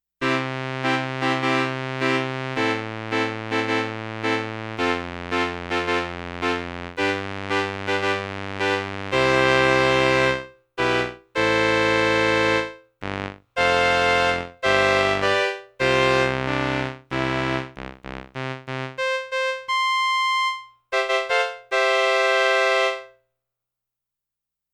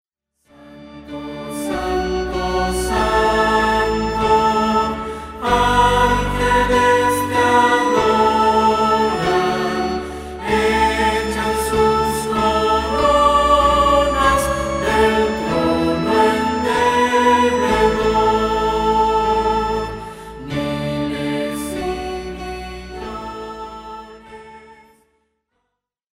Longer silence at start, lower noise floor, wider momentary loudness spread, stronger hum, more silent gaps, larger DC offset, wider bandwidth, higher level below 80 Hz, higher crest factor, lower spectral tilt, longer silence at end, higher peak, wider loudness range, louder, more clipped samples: second, 0.2 s vs 0.6 s; first, -86 dBFS vs -76 dBFS; second, 12 LU vs 15 LU; first, 60 Hz at -70 dBFS vs none; neither; neither; second, 13.5 kHz vs 16 kHz; second, -50 dBFS vs -32 dBFS; first, 22 dB vs 16 dB; about the same, -4.5 dB/octave vs -4.5 dB/octave; first, 1.65 s vs 1.4 s; about the same, -2 dBFS vs -2 dBFS; second, 5 LU vs 10 LU; second, -22 LUFS vs -17 LUFS; neither